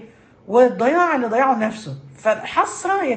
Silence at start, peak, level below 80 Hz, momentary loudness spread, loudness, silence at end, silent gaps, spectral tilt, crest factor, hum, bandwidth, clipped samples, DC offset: 0 s; -4 dBFS; -62 dBFS; 9 LU; -18 LUFS; 0 s; none; -5 dB/octave; 16 dB; none; 8.8 kHz; under 0.1%; under 0.1%